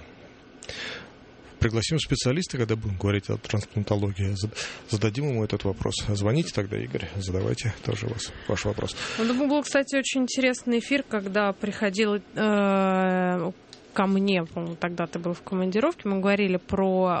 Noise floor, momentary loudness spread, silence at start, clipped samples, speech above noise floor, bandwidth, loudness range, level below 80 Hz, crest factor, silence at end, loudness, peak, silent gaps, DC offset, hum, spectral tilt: -49 dBFS; 8 LU; 0 s; under 0.1%; 23 dB; 8.8 kHz; 3 LU; -48 dBFS; 18 dB; 0 s; -26 LUFS; -8 dBFS; none; under 0.1%; none; -5.5 dB/octave